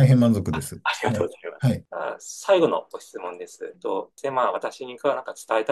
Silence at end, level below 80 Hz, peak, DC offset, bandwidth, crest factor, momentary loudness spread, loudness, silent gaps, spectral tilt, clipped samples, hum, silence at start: 0 s; -58 dBFS; -6 dBFS; under 0.1%; 12.5 kHz; 18 dB; 15 LU; -25 LUFS; none; -6.5 dB/octave; under 0.1%; none; 0 s